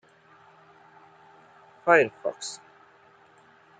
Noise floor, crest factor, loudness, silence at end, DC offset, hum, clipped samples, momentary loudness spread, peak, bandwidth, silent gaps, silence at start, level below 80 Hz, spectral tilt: -57 dBFS; 24 dB; -25 LUFS; 1.25 s; under 0.1%; none; under 0.1%; 17 LU; -6 dBFS; 9.4 kHz; none; 1.85 s; -80 dBFS; -3.5 dB/octave